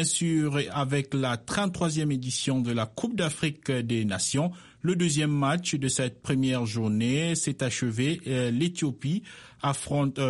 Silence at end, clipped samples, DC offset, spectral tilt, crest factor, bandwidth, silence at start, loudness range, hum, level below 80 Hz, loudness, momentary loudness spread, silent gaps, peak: 0 s; under 0.1%; under 0.1%; -4.5 dB/octave; 14 dB; 11.5 kHz; 0 s; 1 LU; none; -58 dBFS; -28 LUFS; 5 LU; none; -12 dBFS